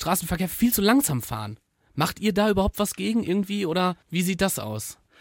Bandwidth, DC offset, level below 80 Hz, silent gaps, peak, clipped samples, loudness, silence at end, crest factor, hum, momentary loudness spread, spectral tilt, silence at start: 17 kHz; under 0.1%; -44 dBFS; none; -6 dBFS; under 0.1%; -24 LUFS; 0.25 s; 18 dB; none; 12 LU; -4.5 dB/octave; 0 s